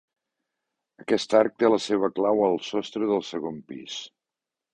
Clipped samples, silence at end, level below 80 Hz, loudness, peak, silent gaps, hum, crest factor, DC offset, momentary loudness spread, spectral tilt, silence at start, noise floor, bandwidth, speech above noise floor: under 0.1%; 0.65 s; -68 dBFS; -24 LUFS; -6 dBFS; none; none; 20 dB; under 0.1%; 15 LU; -5 dB/octave; 1.1 s; -88 dBFS; 10 kHz; 64 dB